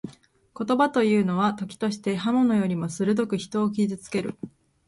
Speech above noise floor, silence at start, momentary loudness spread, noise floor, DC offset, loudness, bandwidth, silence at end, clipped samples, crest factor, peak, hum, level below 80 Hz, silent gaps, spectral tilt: 28 dB; 0.05 s; 12 LU; -52 dBFS; under 0.1%; -25 LUFS; 11.5 kHz; 0.4 s; under 0.1%; 16 dB; -8 dBFS; none; -64 dBFS; none; -6.5 dB/octave